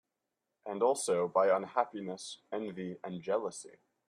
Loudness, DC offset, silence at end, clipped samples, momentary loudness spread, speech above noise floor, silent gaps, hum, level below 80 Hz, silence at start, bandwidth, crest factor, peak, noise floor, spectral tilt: -34 LUFS; under 0.1%; 0.4 s; under 0.1%; 15 LU; 53 dB; none; none; -82 dBFS; 0.65 s; 14 kHz; 20 dB; -14 dBFS; -87 dBFS; -4 dB/octave